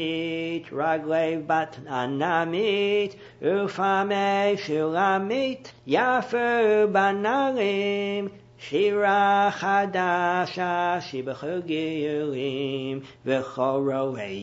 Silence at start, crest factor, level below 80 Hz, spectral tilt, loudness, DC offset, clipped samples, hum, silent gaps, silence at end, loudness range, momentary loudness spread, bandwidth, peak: 0 s; 18 dB; -68 dBFS; -5.5 dB/octave; -25 LUFS; under 0.1%; under 0.1%; none; none; 0 s; 5 LU; 9 LU; 8 kHz; -6 dBFS